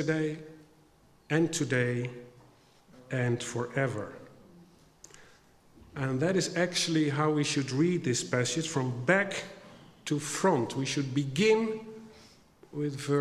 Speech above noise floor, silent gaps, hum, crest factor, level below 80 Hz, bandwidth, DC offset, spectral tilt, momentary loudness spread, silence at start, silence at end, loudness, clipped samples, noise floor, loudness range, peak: 32 dB; none; none; 22 dB; -68 dBFS; 14.5 kHz; under 0.1%; -5 dB/octave; 17 LU; 0 s; 0 s; -30 LUFS; under 0.1%; -62 dBFS; 7 LU; -8 dBFS